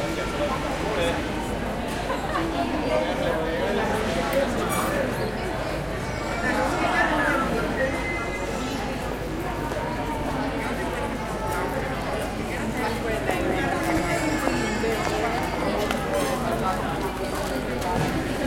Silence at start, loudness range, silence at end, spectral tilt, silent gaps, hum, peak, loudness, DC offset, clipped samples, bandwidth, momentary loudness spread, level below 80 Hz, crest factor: 0 s; 3 LU; 0 s; -5 dB/octave; none; none; -6 dBFS; -26 LUFS; under 0.1%; under 0.1%; 16.5 kHz; 5 LU; -38 dBFS; 20 dB